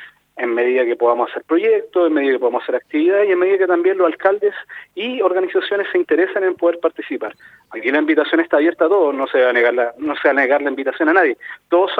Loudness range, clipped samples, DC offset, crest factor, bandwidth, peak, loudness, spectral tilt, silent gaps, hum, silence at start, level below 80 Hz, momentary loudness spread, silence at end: 3 LU; under 0.1%; under 0.1%; 16 dB; 4.6 kHz; 0 dBFS; -17 LUFS; -5.5 dB/octave; none; 50 Hz at -70 dBFS; 0 s; -70 dBFS; 9 LU; 0 s